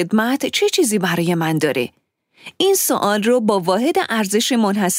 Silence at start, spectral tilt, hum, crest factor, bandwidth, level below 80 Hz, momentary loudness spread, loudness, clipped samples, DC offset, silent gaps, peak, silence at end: 0 s; -4 dB/octave; none; 16 dB; 16.5 kHz; -66 dBFS; 3 LU; -17 LUFS; under 0.1%; under 0.1%; none; -2 dBFS; 0 s